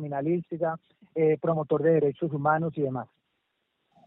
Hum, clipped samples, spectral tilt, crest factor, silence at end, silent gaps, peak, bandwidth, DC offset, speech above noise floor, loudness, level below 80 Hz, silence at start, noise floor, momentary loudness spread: none; under 0.1%; -8.5 dB/octave; 18 dB; 1 s; none; -10 dBFS; 3.9 kHz; under 0.1%; 51 dB; -27 LUFS; -70 dBFS; 0 s; -77 dBFS; 13 LU